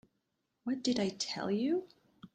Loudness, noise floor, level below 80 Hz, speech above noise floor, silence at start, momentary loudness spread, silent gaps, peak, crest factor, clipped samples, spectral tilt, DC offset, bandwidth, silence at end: -35 LUFS; -82 dBFS; -74 dBFS; 48 dB; 0.65 s; 6 LU; none; -20 dBFS; 16 dB; under 0.1%; -4.5 dB/octave; under 0.1%; 9.4 kHz; 0.1 s